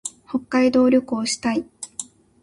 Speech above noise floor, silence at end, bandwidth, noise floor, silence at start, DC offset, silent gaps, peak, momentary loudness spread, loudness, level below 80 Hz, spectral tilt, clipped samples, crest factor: 19 dB; 0.4 s; 11.5 kHz; -38 dBFS; 0.05 s; under 0.1%; none; -6 dBFS; 16 LU; -20 LUFS; -58 dBFS; -3.5 dB/octave; under 0.1%; 16 dB